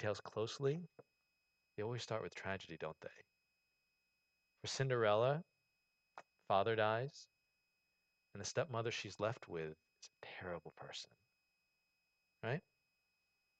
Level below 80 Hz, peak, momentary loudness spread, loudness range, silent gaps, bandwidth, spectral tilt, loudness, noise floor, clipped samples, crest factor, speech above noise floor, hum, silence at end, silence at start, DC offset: -80 dBFS; -22 dBFS; 22 LU; 11 LU; none; 8.8 kHz; -5 dB/octave; -42 LUFS; -85 dBFS; under 0.1%; 22 dB; 43 dB; none; 1 s; 0 s; under 0.1%